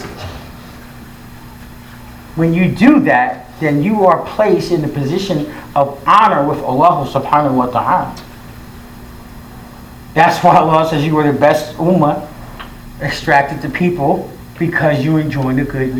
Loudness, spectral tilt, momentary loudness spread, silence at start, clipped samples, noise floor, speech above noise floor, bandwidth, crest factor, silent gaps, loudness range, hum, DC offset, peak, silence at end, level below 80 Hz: -13 LUFS; -7 dB/octave; 25 LU; 0 s; 0.1%; -34 dBFS; 21 dB; over 20 kHz; 14 dB; none; 3 LU; none; under 0.1%; 0 dBFS; 0 s; -38 dBFS